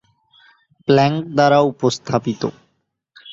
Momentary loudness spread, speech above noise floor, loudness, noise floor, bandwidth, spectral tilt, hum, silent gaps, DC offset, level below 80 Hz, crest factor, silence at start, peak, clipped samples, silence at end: 12 LU; 52 dB; -17 LUFS; -69 dBFS; 7.8 kHz; -6 dB/octave; none; none; under 0.1%; -56 dBFS; 18 dB; 0.9 s; -2 dBFS; under 0.1%; 0 s